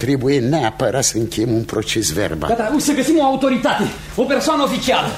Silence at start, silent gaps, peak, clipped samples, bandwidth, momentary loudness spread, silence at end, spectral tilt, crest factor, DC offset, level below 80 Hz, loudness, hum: 0 s; none; -2 dBFS; under 0.1%; 16 kHz; 5 LU; 0 s; -4.5 dB/octave; 14 dB; under 0.1%; -40 dBFS; -17 LUFS; none